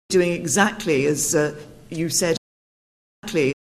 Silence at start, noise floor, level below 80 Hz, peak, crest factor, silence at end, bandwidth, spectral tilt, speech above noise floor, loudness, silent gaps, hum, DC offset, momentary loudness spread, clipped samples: 0.1 s; under -90 dBFS; -54 dBFS; -4 dBFS; 18 dB; 0.15 s; 13.5 kHz; -3.5 dB/octave; over 69 dB; -21 LUFS; 2.38-3.22 s; none; under 0.1%; 11 LU; under 0.1%